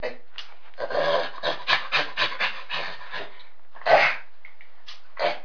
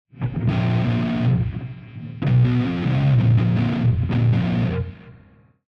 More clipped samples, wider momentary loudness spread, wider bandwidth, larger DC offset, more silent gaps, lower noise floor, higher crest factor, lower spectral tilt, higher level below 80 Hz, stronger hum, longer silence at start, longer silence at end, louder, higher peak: neither; first, 22 LU vs 12 LU; about the same, 5.4 kHz vs 5.6 kHz; first, 3% vs under 0.1%; neither; about the same, -53 dBFS vs -52 dBFS; first, 24 dB vs 12 dB; second, -2.5 dB/octave vs -9.5 dB/octave; second, -68 dBFS vs -40 dBFS; neither; second, 0 s vs 0.15 s; second, 0 s vs 0.6 s; second, -24 LUFS vs -20 LUFS; first, -4 dBFS vs -8 dBFS